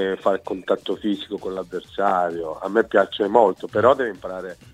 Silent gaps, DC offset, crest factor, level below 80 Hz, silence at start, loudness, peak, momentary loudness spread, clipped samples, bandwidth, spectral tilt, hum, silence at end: none; under 0.1%; 20 dB; -58 dBFS; 0 s; -22 LUFS; 0 dBFS; 12 LU; under 0.1%; 12 kHz; -6 dB/octave; none; 0.2 s